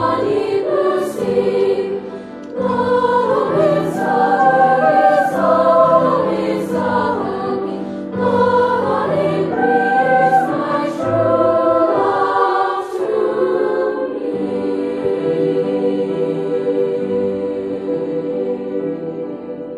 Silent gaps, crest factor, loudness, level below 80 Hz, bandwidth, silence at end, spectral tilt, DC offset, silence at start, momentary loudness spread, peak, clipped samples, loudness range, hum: none; 14 dB; -16 LUFS; -56 dBFS; 13 kHz; 0 s; -7 dB/octave; under 0.1%; 0 s; 9 LU; -2 dBFS; under 0.1%; 5 LU; none